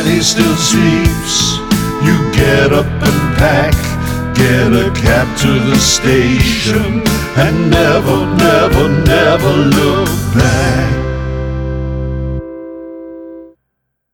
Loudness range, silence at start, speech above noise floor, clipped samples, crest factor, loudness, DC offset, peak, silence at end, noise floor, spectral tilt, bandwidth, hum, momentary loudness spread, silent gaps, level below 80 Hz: 5 LU; 0 s; 59 dB; under 0.1%; 12 dB; -11 LUFS; under 0.1%; 0 dBFS; 0.65 s; -70 dBFS; -5 dB/octave; 19 kHz; none; 10 LU; none; -24 dBFS